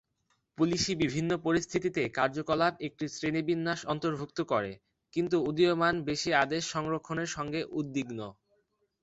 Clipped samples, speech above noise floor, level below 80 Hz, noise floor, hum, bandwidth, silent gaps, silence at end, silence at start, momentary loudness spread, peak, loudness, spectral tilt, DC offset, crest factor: under 0.1%; 46 dB; -62 dBFS; -76 dBFS; none; 8.2 kHz; none; 0.7 s; 0.6 s; 8 LU; -10 dBFS; -31 LUFS; -5 dB/octave; under 0.1%; 20 dB